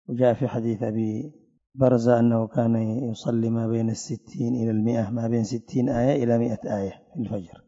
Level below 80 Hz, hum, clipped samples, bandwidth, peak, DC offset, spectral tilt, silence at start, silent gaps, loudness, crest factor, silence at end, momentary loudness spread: -56 dBFS; none; under 0.1%; 7.8 kHz; -6 dBFS; under 0.1%; -8 dB/octave; 0.1 s; none; -25 LUFS; 18 dB; 0.2 s; 11 LU